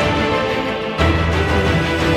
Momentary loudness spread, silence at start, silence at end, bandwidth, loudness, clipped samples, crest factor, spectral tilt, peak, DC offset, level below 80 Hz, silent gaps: 4 LU; 0 s; 0 s; 13.5 kHz; -17 LUFS; under 0.1%; 14 dB; -6 dB/octave; -2 dBFS; under 0.1%; -26 dBFS; none